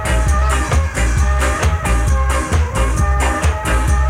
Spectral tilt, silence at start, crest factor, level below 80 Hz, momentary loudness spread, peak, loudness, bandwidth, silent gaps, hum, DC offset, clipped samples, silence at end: -5 dB/octave; 0 s; 10 dB; -16 dBFS; 2 LU; -4 dBFS; -16 LUFS; 14 kHz; none; none; under 0.1%; under 0.1%; 0 s